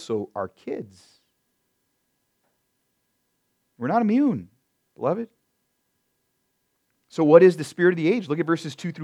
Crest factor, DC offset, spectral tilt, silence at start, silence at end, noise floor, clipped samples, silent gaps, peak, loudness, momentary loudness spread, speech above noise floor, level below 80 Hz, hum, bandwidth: 24 dB; under 0.1%; -7 dB/octave; 0 s; 0 s; -74 dBFS; under 0.1%; none; 0 dBFS; -21 LUFS; 19 LU; 52 dB; -76 dBFS; none; 11.5 kHz